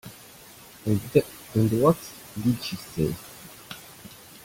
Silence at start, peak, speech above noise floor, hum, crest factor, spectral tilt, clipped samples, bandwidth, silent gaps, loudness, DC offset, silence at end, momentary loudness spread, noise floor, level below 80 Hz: 0.05 s; -6 dBFS; 24 dB; none; 22 dB; -6.5 dB/octave; under 0.1%; 17 kHz; none; -26 LUFS; under 0.1%; 0.35 s; 22 LU; -48 dBFS; -54 dBFS